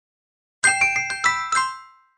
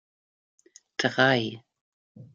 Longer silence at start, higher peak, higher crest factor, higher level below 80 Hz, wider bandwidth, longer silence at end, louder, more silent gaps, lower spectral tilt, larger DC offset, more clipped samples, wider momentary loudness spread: second, 0.65 s vs 1 s; first, -2 dBFS vs -6 dBFS; about the same, 22 dB vs 24 dB; first, -64 dBFS vs -72 dBFS; first, 10.5 kHz vs 7.8 kHz; first, 0.3 s vs 0.1 s; first, -20 LUFS vs -25 LUFS; second, none vs 1.81-2.15 s; second, 1 dB/octave vs -4.5 dB/octave; neither; neither; second, 9 LU vs 16 LU